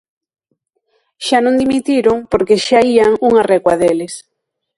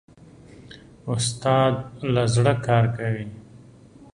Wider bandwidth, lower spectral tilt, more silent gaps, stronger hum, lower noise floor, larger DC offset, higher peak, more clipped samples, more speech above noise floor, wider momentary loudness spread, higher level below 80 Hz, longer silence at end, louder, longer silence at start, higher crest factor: about the same, 11.5 kHz vs 11.5 kHz; about the same, -4.5 dB/octave vs -5.5 dB/octave; neither; neither; first, -68 dBFS vs -48 dBFS; neither; first, 0 dBFS vs -4 dBFS; neither; first, 56 dB vs 27 dB; about the same, 9 LU vs 11 LU; about the same, -46 dBFS vs -50 dBFS; about the same, 0.55 s vs 0.55 s; first, -13 LUFS vs -22 LUFS; first, 1.2 s vs 0.6 s; second, 14 dB vs 20 dB